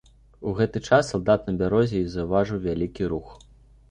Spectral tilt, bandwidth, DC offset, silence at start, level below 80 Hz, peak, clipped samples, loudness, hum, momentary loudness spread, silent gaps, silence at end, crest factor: -7 dB/octave; 10.5 kHz; under 0.1%; 0.4 s; -44 dBFS; -4 dBFS; under 0.1%; -24 LUFS; none; 8 LU; none; 0.55 s; 20 dB